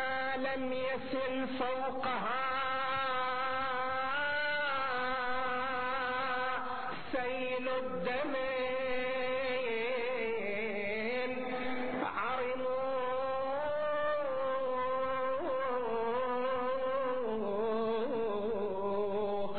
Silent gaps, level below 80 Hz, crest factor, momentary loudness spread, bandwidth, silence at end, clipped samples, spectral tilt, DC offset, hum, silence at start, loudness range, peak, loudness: none; -64 dBFS; 14 dB; 3 LU; 4.6 kHz; 0 s; under 0.1%; -1.5 dB/octave; 0.7%; none; 0 s; 2 LU; -22 dBFS; -34 LUFS